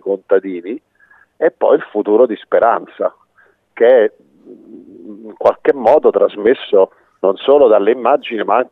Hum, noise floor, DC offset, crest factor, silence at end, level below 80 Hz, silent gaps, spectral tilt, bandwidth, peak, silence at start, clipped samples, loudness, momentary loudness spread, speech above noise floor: none; -54 dBFS; under 0.1%; 14 dB; 0.05 s; -62 dBFS; none; -7 dB/octave; 4.3 kHz; 0 dBFS; 0.05 s; under 0.1%; -14 LUFS; 11 LU; 41 dB